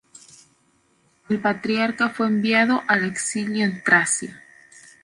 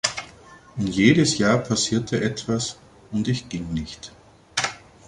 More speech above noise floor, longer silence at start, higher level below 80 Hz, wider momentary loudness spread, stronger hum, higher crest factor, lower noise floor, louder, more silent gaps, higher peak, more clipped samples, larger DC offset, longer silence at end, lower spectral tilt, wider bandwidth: first, 42 dB vs 25 dB; first, 1.3 s vs 0.05 s; second, -66 dBFS vs -48 dBFS; second, 7 LU vs 18 LU; neither; about the same, 20 dB vs 20 dB; first, -63 dBFS vs -47 dBFS; about the same, -21 LUFS vs -23 LUFS; neither; about the same, -4 dBFS vs -2 dBFS; neither; neither; first, 0.65 s vs 0.3 s; about the same, -3.5 dB/octave vs -4.5 dB/octave; about the same, 11.5 kHz vs 11.5 kHz